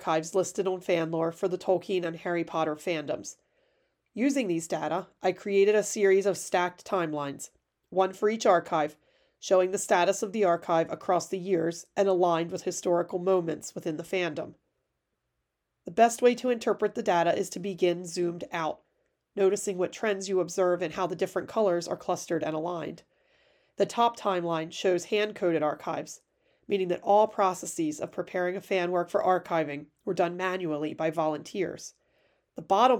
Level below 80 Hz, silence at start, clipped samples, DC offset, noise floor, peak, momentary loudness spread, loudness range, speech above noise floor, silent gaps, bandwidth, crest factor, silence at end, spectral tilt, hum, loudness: -74 dBFS; 0 s; under 0.1%; under 0.1%; -82 dBFS; -8 dBFS; 11 LU; 4 LU; 54 dB; none; 18.5 kHz; 20 dB; 0 s; -4.5 dB/octave; none; -28 LUFS